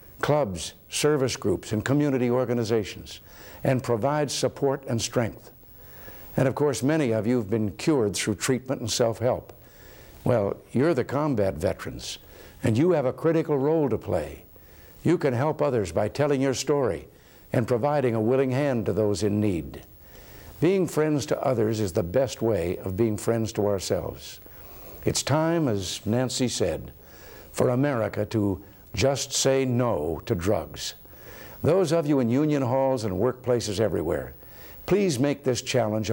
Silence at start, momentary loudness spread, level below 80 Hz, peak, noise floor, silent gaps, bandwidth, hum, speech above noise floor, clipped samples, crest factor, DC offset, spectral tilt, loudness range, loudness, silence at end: 0 s; 15 LU; -52 dBFS; -8 dBFS; -49 dBFS; none; 17 kHz; none; 24 dB; under 0.1%; 18 dB; under 0.1%; -5.5 dB/octave; 2 LU; -25 LUFS; 0 s